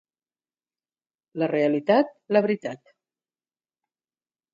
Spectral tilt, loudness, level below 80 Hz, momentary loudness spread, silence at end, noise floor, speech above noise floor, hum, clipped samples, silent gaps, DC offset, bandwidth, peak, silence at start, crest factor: -7.5 dB/octave; -23 LUFS; -80 dBFS; 16 LU; 1.75 s; under -90 dBFS; over 67 dB; none; under 0.1%; none; under 0.1%; 7.6 kHz; -8 dBFS; 1.35 s; 20 dB